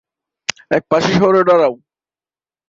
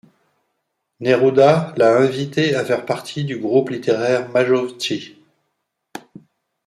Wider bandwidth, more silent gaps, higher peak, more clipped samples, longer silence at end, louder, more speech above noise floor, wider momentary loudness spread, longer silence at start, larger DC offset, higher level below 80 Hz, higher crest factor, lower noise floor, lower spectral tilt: second, 7.8 kHz vs 12.5 kHz; neither; about the same, 0 dBFS vs -2 dBFS; neither; first, 0.95 s vs 0.7 s; first, -14 LUFS vs -18 LUFS; first, over 77 dB vs 57 dB; about the same, 13 LU vs 12 LU; second, 0.5 s vs 1 s; neither; first, -54 dBFS vs -64 dBFS; about the same, 16 dB vs 18 dB; first, under -90 dBFS vs -74 dBFS; about the same, -5 dB/octave vs -6 dB/octave